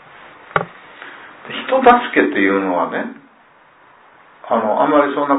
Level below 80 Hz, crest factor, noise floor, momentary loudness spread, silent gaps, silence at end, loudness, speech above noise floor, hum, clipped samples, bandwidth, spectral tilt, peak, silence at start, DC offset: -56 dBFS; 18 dB; -49 dBFS; 24 LU; none; 0 s; -16 LUFS; 34 dB; none; under 0.1%; 4 kHz; -9 dB/octave; 0 dBFS; 0.25 s; under 0.1%